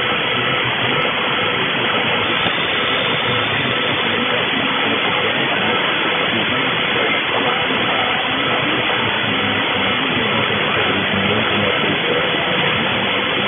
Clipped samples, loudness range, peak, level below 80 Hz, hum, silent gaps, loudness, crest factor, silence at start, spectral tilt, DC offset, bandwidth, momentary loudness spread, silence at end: under 0.1%; 0 LU; -2 dBFS; -50 dBFS; none; none; -16 LUFS; 16 dB; 0 s; -7.5 dB/octave; under 0.1%; 4 kHz; 1 LU; 0 s